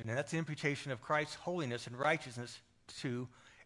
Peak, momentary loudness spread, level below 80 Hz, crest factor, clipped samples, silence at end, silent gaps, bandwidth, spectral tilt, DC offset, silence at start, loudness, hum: -18 dBFS; 14 LU; -76 dBFS; 22 dB; under 0.1%; 0 s; none; 11.5 kHz; -5 dB/octave; under 0.1%; 0 s; -38 LUFS; none